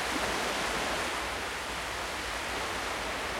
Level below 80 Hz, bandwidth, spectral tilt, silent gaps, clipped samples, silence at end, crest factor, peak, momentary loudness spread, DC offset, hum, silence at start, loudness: -50 dBFS; 16.5 kHz; -2 dB/octave; none; under 0.1%; 0 s; 16 dB; -18 dBFS; 4 LU; under 0.1%; none; 0 s; -32 LUFS